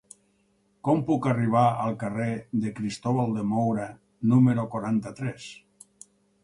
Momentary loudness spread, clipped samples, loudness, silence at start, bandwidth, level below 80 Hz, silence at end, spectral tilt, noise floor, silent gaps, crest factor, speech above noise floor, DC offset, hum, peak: 13 LU; under 0.1%; -26 LUFS; 0.85 s; 11.5 kHz; -62 dBFS; 0.9 s; -8 dB/octave; -67 dBFS; none; 18 dB; 43 dB; under 0.1%; none; -8 dBFS